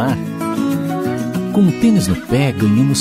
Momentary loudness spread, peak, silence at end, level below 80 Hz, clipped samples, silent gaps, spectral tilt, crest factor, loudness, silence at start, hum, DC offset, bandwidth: 7 LU; -2 dBFS; 0 s; -42 dBFS; under 0.1%; none; -6.5 dB/octave; 12 dB; -16 LUFS; 0 s; none; under 0.1%; 16 kHz